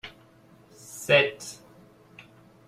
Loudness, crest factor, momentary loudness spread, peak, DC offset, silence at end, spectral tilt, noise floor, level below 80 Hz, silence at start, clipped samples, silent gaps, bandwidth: -22 LUFS; 24 dB; 24 LU; -6 dBFS; under 0.1%; 1.15 s; -3 dB/octave; -56 dBFS; -68 dBFS; 0.05 s; under 0.1%; none; 15.5 kHz